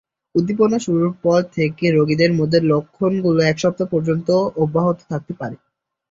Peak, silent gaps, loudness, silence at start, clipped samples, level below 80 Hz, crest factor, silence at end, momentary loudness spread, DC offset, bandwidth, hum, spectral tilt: -2 dBFS; none; -18 LUFS; 0.35 s; under 0.1%; -56 dBFS; 16 dB; 0.55 s; 9 LU; under 0.1%; 7.8 kHz; none; -7 dB/octave